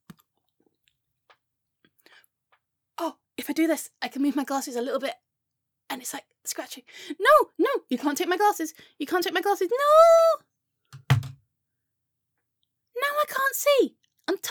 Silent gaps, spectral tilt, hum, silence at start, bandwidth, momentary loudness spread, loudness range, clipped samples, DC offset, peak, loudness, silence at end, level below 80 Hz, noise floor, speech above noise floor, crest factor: none; -4.5 dB/octave; none; 3 s; over 20 kHz; 18 LU; 10 LU; under 0.1%; under 0.1%; -6 dBFS; -24 LUFS; 0 s; -66 dBFS; -82 dBFS; 59 dB; 20 dB